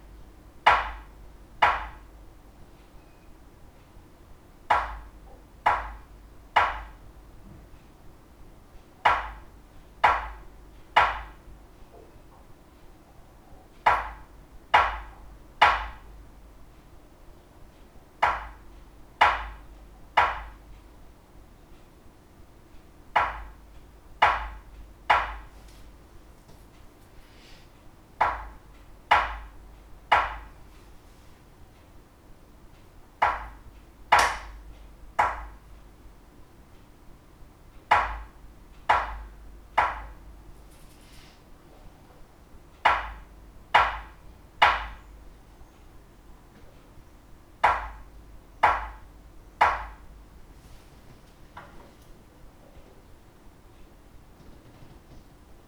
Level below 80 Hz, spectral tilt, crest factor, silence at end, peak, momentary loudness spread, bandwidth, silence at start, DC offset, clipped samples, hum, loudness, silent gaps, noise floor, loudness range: -46 dBFS; -3 dB/octave; 26 dB; 0.5 s; -4 dBFS; 26 LU; over 20 kHz; 0.15 s; under 0.1%; under 0.1%; none; -25 LUFS; none; -52 dBFS; 8 LU